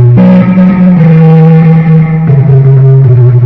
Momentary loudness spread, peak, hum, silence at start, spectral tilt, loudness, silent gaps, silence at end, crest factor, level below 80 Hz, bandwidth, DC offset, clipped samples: 3 LU; 0 dBFS; none; 0 s; -12 dB/octave; -4 LUFS; none; 0 s; 2 dB; -34 dBFS; 3.7 kHz; 0.6%; 10%